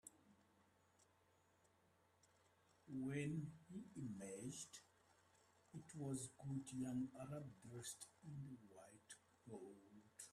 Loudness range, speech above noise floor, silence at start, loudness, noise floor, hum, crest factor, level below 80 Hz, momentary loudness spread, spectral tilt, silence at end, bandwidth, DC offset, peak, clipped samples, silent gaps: 4 LU; 27 dB; 0.05 s; -52 LUFS; -78 dBFS; none; 20 dB; -84 dBFS; 16 LU; -5.5 dB/octave; 0 s; 13.5 kHz; under 0.1%; -34 dBFS; under 0.1%; none